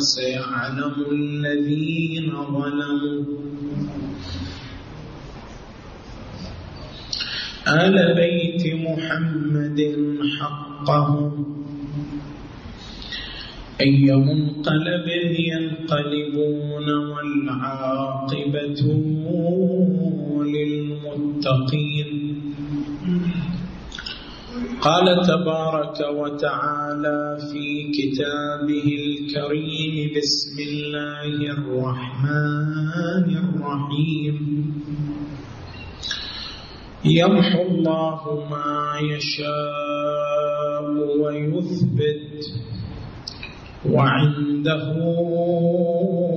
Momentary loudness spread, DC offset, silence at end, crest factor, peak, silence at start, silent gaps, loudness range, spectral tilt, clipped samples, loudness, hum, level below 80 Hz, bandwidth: 16 LU; under 0.1%; 0 s; 18 dB; -4 dBFS; 0 s; none; 5 LU; -6.5 dB/octave; under 0.1%; -22 LUFS; none; -48 dBFS; 7.4 kHz